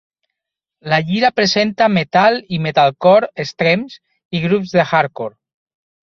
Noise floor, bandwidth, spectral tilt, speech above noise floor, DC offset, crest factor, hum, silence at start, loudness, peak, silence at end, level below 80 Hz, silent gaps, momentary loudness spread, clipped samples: -83 dBFS; 7.2 kHz; -5.5 dB/octave; 68 dB; under 0.1%; 16 dB; none; 0.85 s; -15 LUFS; -2 dBFS; 0.8 s; -56 dBFS; 4.25-4.31 s; 12 LU; under 0.1%